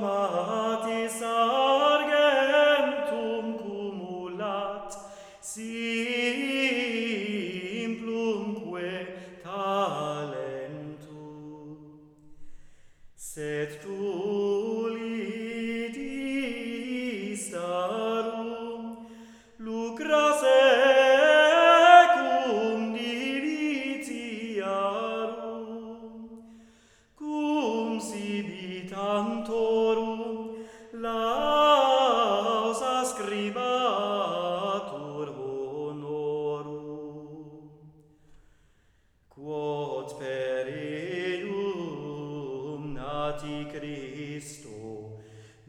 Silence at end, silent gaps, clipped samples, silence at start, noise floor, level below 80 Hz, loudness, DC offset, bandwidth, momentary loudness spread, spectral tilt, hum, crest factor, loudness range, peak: 0.2 s; none; under 0.1%; 0 s; -64 dBFS; -62 dBFS; -27 LUFS; under 0.1%; 14.5 kHz; 20 LU; -4 dB/octave; none; 26 dB; 16 LU; -2 dBFS